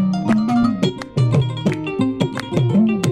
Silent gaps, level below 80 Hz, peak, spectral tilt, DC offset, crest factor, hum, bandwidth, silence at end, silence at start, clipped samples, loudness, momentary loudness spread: none; -46 dBFS; -4 dBFS; -7 dB/octave; 0.1%; 14 dB; none; 12.5 kHz; 0 s; 0 s; under 0.1%; -18 LUFS; 5 LU